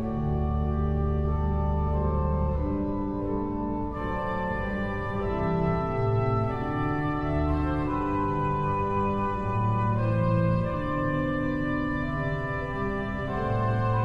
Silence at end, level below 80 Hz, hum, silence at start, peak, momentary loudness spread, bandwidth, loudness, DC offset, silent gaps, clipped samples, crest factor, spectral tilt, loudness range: 0 s; -34 dBFS; none; 0 s; -12 dBFS; 4 LU; 5.6 kHz; -28 LUFS; under 0.1%; none; under 0.1%; 14 dB; -9.5 dB/octave; 2 LU